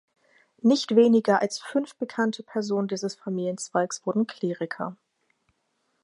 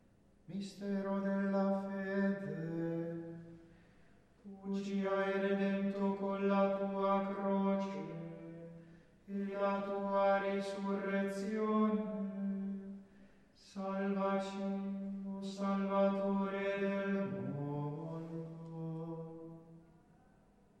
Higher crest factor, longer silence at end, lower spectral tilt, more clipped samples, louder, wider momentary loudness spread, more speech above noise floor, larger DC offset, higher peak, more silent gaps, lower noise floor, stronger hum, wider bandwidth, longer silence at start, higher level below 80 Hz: about the same, 20 dB vs 16 dB; first, 1.1 s vs 0.95 s; second, -5 dB/octave vs -8 dB/octave; neither; first, -26 LUFS vs -37 LUFS; second, 12 LU vs 15 LU; first, 49 dB vs 30 dB; neither; first, -6 dBFS vs -22 dBFS; neither; first, -74 dBFS vs -67 dBFS; neither; first, 11.5 kHz vs 9.2 kHz; first, 0.65 s vs 0.5 s; second, -80 dBFS vs -74 dBFS